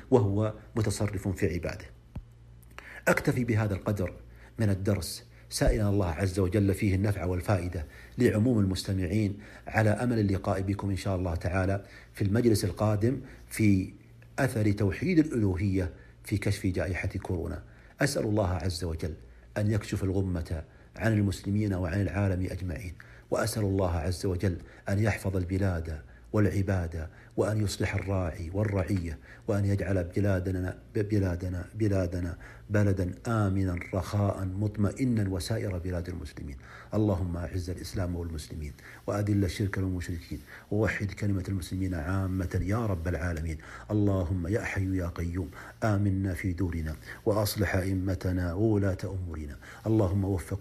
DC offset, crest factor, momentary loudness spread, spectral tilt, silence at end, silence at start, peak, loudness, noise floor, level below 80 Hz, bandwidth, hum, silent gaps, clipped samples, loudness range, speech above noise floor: under 0.1%; 22 dB; 12 LU; -7 dB/octave; 0 s; 0 s; -8 dBFS; -30 LUFS; -52 dBFS; -44 dBFS; 14.5 kHz; none; none; under 0.1%; 3 LU; 23 dB